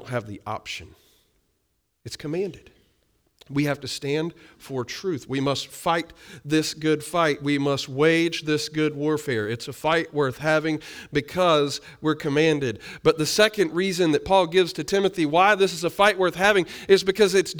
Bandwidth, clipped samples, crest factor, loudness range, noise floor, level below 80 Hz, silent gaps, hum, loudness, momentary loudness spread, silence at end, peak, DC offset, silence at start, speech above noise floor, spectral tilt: over 20 kHz; under 0.1%; 18 dB; 10 LU; -73 dBFS; -56 dBFS; none; none; -23 LUFS; 12 LU; 0 s; -4 dBFS; under 0.1%; 0 s; 50 dB; -4.5 dB/octave